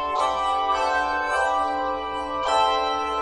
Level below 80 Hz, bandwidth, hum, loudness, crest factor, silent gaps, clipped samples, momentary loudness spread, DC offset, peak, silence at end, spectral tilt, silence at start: -48 dBFS; 10.5 kHz; none; -23 LUFS; 14 dB; none; under 0.1%; 6 LU; 0.1%; -10 dBFS; 0 s; -2.5 dB/octave; 0 s